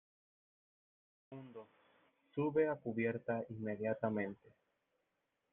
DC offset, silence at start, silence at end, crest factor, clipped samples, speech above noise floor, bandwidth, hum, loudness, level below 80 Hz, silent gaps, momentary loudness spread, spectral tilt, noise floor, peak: under 0.1%; 1.3 s; 1.15 s; 20 dB; under 0.1%; 47 dB; 3.8 kHz; none; -39 LUFS; -82 dBFS; none; 20 LU; -7.5 dB/octave; -85 dBFS; -22 dBFS